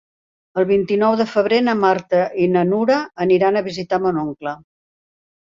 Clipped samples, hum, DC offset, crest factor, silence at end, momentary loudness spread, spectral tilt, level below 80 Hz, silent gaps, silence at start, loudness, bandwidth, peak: under 0.1%; none; under 0.1%; 16 dB; 0.9 s; 9 LU; -7 dB/octave; -58 dBFS; none; 0.55 s; -18 LUFS; 7.4 kHz; -2 dBFS